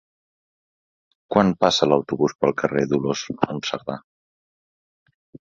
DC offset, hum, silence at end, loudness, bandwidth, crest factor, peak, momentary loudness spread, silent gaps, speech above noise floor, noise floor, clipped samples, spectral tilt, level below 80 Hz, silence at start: under 0.1%; none; 0.2 s; -21 LUFS; 7.8 kHz; 22 dB; 0 dBFS; 10 LU; 2.35-2.39 s, 4.04-5.06 s, 5.14-5.33 s; over 69 dB; under -90 dBFS; under 0.1%; -5 dB/octave; -56 dBFS; 1.3 s